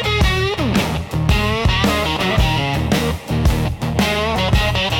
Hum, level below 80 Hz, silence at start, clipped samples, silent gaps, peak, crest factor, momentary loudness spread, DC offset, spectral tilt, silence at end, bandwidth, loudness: none; -24 dBFS; 0 s; under 0.1%; none; -2 dBFS; 14 dB; 4 LU; under 0.1%; -5 dB/octave; 0 s; 17 kHz; -17 LUFS